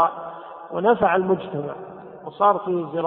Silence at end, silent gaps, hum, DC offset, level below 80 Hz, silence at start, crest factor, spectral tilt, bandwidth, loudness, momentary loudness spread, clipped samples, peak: 0 s; none; none; under 0.1%; -60 dBFS; 0 s; 18 dB; -11 dB/octave; 4.1 kHz; -21 LUFS; 19 LU; under 0.1%; -4 dBFS